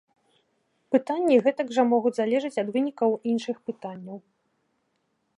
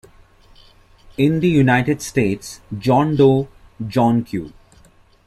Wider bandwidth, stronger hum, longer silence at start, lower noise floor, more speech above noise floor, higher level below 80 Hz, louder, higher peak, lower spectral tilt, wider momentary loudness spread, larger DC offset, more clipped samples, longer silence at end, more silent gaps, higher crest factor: second, 11 kHz vs 14 kHz; neither; second, 0.9 s vs 1.2 s; first, -74 dBFS vs -51 dBFS; first, 49 dB vs 34 dB; second, -80 dBFS vs -46 dBFS; second, -25 LUFS vs -17 LUFS; second, -8 dBFS vs -2 dBFS; about the same, -6 dB/octave vs -7 dB/octave; about the same, 16 LU vs 17 LU; neither; neither; first, 1.2 s vs 0.75 s; neither; about the same, 18 dB vs 16 dB